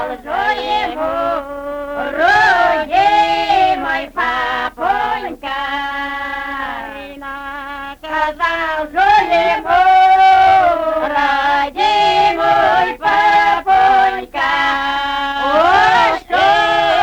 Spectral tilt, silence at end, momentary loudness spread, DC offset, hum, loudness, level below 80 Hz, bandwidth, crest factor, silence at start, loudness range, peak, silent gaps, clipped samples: -3.5 dB/octave; 0 s; 12 LU; under 0.1%; none; -14 LUFS; -42 dBFS; 19.5 kHz; 12 dB; 0 s; 9 LU; -2 dBFS; none; under 0.1%